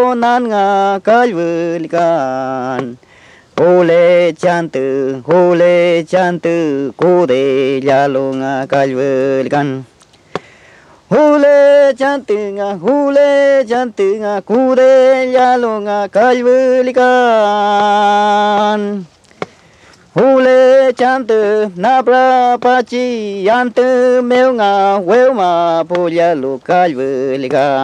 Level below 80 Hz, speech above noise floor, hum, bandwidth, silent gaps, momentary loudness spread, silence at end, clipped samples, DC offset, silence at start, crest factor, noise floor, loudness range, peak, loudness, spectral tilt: -62 dBFS; 33 dB; none; 9.2 kHz; none; 9 LU; 0 s; under 0.1%; under 0.1%; 0 s; 10 dB; -44 dBFS; 3 LU; 0 dBFS; -11 LUFS; -6 dB/octave